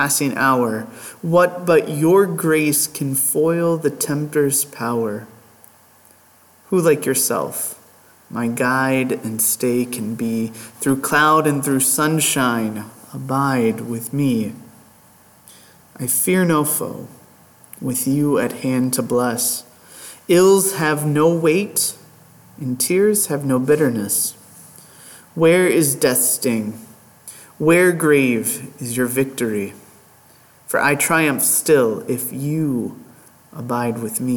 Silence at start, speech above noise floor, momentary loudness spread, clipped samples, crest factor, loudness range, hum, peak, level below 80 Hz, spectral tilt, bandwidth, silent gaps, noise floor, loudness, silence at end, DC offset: 0 s; 33 dB; 13 LU; under 0.1%; 16 dB; 5 LU; none; -4 dBFS; -62 dBFS; -4.5 dB/octave; 19 kHz; none; -51 dBFS; -18 LUFS; 0 s; under 0.1%